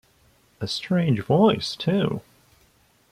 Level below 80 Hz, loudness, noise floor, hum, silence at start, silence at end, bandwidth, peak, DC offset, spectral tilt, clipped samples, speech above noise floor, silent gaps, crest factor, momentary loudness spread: -58 dBFS; -23 LUFS; -60 dBFS; none; 0.6 s; 0.9 s; 14.5 kHz; -6 dBFS; under 0.1%; -6.5 dB/octave; under 0.1%; 39 dB; none; 20 dB; 12 LU